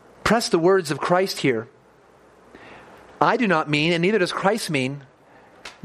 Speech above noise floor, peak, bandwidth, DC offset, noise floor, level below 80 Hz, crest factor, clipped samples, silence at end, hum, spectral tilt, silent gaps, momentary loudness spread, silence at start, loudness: 33 dB; 0 dBFS; 15 kHz; under 0.1%; -53 dBFS; -56 dBFS; 22 dB; under 0.1%; 0.15 s; none; -5 dB/octave; none; 11 LU; 0.25 s; -21 LUFS